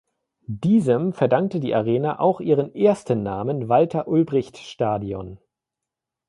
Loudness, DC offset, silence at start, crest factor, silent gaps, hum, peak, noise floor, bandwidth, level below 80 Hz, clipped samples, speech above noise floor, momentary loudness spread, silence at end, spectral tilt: -21 LUFS; under 0.1%; 0.5 s; 18 dB; none; none; -4 dBFS; -86 dBFS; 11.5 kHz; -56 dBFS; under 0.1%; 65 dB; 8 LU; 0.9 s; -8.5 dB/octave